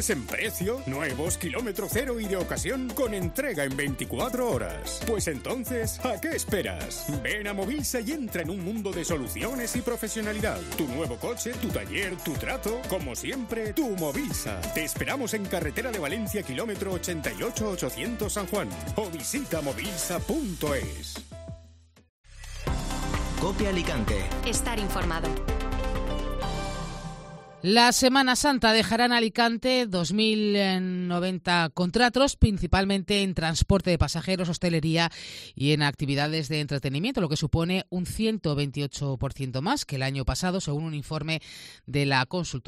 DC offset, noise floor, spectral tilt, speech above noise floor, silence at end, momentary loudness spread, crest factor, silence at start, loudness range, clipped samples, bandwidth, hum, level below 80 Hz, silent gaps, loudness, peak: under 0.1%; -54 dBFS; -4.5 dB/octave; 27 dB; 0.05 s; 9 LU; 22 dB; 0 s; 7 LU; under 0.1%; 16 kHz; none; -38 dBFS; 22.09-22.24 s; -27 LUFS; -6 dBFS